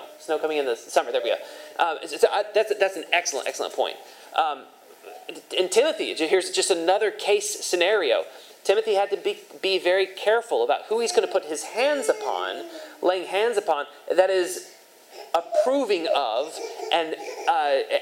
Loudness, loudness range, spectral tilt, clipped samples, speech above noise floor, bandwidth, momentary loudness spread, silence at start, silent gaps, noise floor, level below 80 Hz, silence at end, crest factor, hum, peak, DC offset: -24 LUFS; 3 LU; -1 dB/octave; under 0.1%; 22 dB; 16.5 kHz; 9 LU; 0 s; none; -46 dBFS; under -90 dBFS; 0 s; 20 dB; none; -4 dBFS; under 0.1%